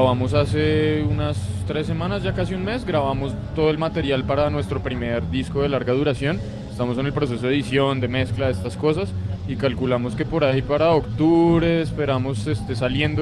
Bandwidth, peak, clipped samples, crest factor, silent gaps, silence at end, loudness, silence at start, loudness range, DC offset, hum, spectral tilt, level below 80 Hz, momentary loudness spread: 11.5 kHz; -6 dBFS; under 0.1%; 16 dB; none; 0 s; -22 LUFS; 0 s; 3 LU; under 0.1%; none; -7.5 dB/octave; -38 dBFS; 7 LU